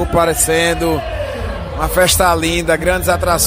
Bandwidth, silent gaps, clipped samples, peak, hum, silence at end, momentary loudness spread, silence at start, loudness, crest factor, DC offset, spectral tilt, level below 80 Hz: 16 kHz; none; under 0.1%; 0 dBFS; none; 0 s; 11 LU; 0 s; -15 LUFS; 14 dB; under 0.1%; -3.5 dB/octave; -26 dBFS